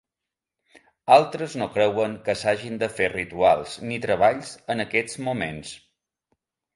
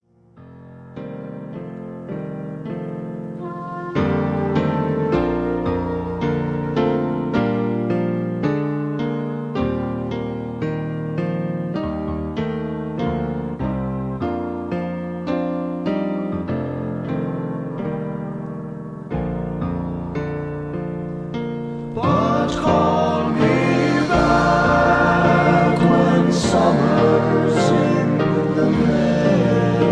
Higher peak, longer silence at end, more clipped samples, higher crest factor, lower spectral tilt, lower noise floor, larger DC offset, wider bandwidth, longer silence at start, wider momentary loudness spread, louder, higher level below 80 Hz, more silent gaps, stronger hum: about the same, -2 dBFS vs -2 dBFS; first, 1 s vs 0 s; neither; about the same, 22 dB vs 18 dB; second, -4.5 dB/octave vs -7.5 dB/octave; first, -87 dBFS vs -46 dBFS; neither; about the same, 11.5 kHz vs 10.5 kHz; first, 1.05 s vs 0.35 s; about the same, 13 LU vs 14 LU; second, -23 LUFS vs -20 LUFS; second, -58 dBFS vs -40 dBFS; neither; neither